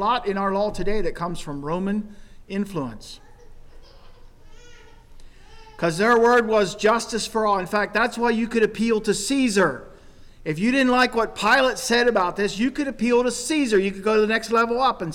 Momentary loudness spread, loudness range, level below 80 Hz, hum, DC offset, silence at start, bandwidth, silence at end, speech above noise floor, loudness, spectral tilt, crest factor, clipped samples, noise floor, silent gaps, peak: 12 LU; 12 LU; -42 dBFS; none; under 0.1%; 0 s; 17 kHz; 0 s; 24 dB; -21 LUFS; -4 dB/octave; 12 dB; under 0.1%; -45 dBFS; none; -10 dBFS